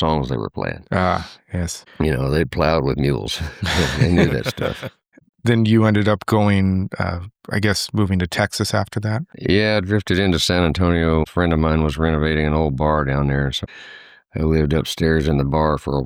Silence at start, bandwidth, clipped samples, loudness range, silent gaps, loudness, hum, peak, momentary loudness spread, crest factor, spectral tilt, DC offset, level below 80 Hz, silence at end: 0 s; over 20 kHz; under 0.1%; 2 LU; 5.29-5.33 s; -19 LUFS; none; -2 dBFS; 9 LU; 16 dB; -6 dB/octave; under 0.1%; -32 dBFS; 0 s